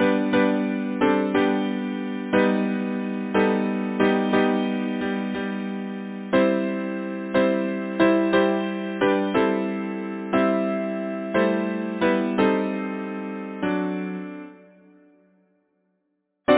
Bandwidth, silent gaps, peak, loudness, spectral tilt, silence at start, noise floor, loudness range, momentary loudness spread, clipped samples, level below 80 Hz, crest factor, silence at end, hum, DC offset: 4 kHz; none; -4 dBFS; -23 LUFS; -10.5 dB/octave; 0 s; -74 dBFS; 4 LU; 9 LU; under 0.1%; -58 dBFS; 18 dB; 0 s; none; under 0.1%